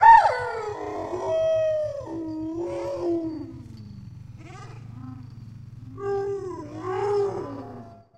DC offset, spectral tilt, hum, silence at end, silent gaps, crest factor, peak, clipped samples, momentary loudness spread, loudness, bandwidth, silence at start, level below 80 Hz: under 0.1%; -6.5 dB/octave; none; 0.2 s; none; 22 dB; -4 dBFS; under 0.1%; 19 LU; -26 LUFS; 9.4 kHz; 0 s; -56 dBFS